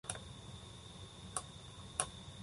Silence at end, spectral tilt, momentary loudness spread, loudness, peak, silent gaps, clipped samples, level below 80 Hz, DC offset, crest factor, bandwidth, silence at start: 0 s; -2.5 dB/octave; 12 LU; -45 LUFS; -16 dBFS; none; under 0.1%; -60 dBFS; under 0.1%; 32 dB; 11.5 kHz; 0.05 s